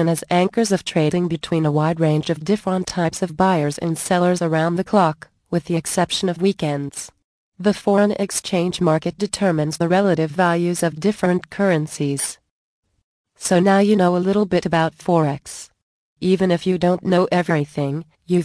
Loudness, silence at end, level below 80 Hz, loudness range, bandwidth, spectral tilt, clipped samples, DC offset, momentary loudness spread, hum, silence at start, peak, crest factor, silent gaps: -19 LUFS; 0 s; -54 dBFS; 2 LU; 11 kHz; -5.5 dB/octave; under 0.1%; under 0.1%; 7 LU; none; 0 s; -2 dBFS; 16 dB; 7.24-7.52 s, 12.50-12.83 s, 13.03-13.24 s, 15.82-16.16 s